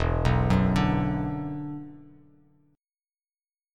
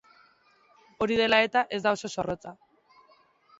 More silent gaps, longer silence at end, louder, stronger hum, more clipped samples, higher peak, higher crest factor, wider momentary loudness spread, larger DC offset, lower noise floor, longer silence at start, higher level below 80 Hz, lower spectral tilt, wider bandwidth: neither; first, 1.7 s vs 1.05 s; about the same, -26 LUFS vs -26 LUFS; neither; neither; about the same, -8 dBFS vs -8 dBFS; about the same, 18 dB vs 22 dB; about the same, 15 LU vs 13 LU; neither; first, under -90 dBFS vs -63 dBFS; second, 0 s vs 1 s; first, -36 dBFS vs -62 dBFS; first, -8 dB/octave vs -4 dB/octave; first, 10 kHz vs 8 kHz